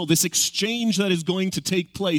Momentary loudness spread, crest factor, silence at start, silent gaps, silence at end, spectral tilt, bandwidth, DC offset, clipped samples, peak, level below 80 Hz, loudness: 5 LU; 18 dB; 0 s; none; 0 s; -3.5 dB/octave; 18.5 kHz; under 0.1%; under 0.1%; -4 dBFS; -58 dBFS; -22 LUFS